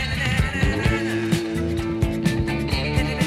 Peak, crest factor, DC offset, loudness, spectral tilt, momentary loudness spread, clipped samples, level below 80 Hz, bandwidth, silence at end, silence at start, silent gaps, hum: -8 dBFS; 14 dB; under 0.1%; -23 LUFS; -6 dB/octave; 3 LU; under 0.1%; -30 dBFS; 15.5 kHz; 0 s; 0 s; none; none